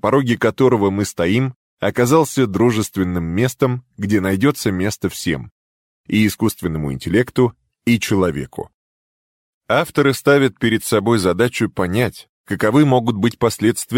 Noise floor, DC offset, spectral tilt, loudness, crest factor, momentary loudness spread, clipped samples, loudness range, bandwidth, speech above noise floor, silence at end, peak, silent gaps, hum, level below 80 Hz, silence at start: under -90 dBFS; under 0.1%; -6 dB/octave; -18 LUFS; 16 dB; 8 LU; under 0.1%; 3 LU; 17 kHz; over 73 dB; 0 s; -2 dBFS; 1.56-1.77 s, 5.51-6.04 s, 8.74-9.61 s, 12.29-12.44 s; none; -46 dBFS; 0.05 s